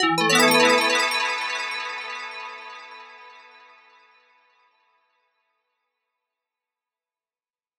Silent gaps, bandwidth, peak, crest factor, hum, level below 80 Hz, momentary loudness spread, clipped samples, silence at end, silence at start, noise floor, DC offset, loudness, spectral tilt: none; over 20 kHz; -6 dBFS; 22 dB; none; -76 dBFS; 23 LU; under 0.1%; 4.45 s; 0 s; under -90 dBFS; under 0.1%; -20 LUFS; -2 dB/octave